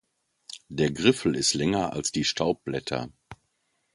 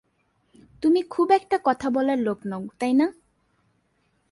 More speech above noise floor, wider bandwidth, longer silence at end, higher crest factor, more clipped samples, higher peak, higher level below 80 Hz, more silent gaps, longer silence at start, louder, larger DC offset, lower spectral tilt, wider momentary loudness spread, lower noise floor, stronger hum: about the same, 48 dB vs 46 dB; about the same, 11.5 kHz vs 11.5 kHz; second, 0.6 s vs 1.2 s; about the same, 22 dB vs 18 dB; neither; about the same, -6 dBFS vs -6 dBFS; first, -54 dBFS vs -64 dBFS; neither; second, 0.5 s vs 0.8 s; second, -26 LUFS vs -23 LUFS; neither; second, -4 dB/octave vs -6.5 dB/octave; first, 15 LU vs 8 LU; first, -74 dBFS vs -69 dBFS; neither